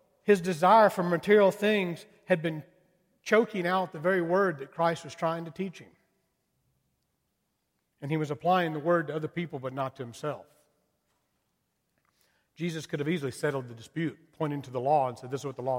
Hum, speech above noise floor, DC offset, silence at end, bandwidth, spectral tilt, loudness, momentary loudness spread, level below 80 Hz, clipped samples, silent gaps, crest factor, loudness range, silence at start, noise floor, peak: none; 51 dB; under 0.1%; 0 s; 16.5 kHz; -6 dB/octave; -28 LUFS; 15 LU; -74 dBFS; under 0.1%; none; 20 dB; 14 LU; 0.25 s; -78 dBFS; -10 dBFS